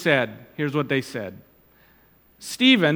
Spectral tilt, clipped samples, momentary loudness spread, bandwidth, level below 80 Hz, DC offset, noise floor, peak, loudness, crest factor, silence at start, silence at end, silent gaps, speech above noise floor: -5 dB/octave; under 0.1%; 19 LU; 18 kHz; -66 dBFS; under 0.1%; -57 dBFS; -2 dBFS; -22 LUFS; 20 dB; 0 s; 0 s; none; 35 dB